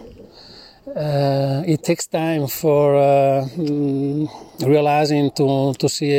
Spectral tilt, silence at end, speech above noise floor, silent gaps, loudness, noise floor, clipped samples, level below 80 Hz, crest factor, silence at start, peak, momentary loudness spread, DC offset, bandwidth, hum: -6 dB/octave; 0 s; 26 dB; none; -18 LUFS; -43 dBFS; under 0.1%; -56 dBFS; 14 dB; 0 s; -4 dBFS; 8 LU; under 0.1%; 16.5 kHz; none